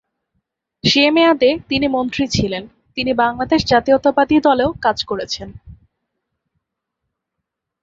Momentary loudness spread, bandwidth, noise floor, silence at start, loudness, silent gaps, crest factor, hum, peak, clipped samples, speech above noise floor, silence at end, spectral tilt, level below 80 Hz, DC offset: 11 LU; 7.8 kHz; -79 dBFS; 0.85 s; -16 LUFS; none; 16 dB; none; -2 dBFS; under 0.1%; 64 dB; 2.1 s; -4.5 dB/octave; -44 dBFS; under 0.1%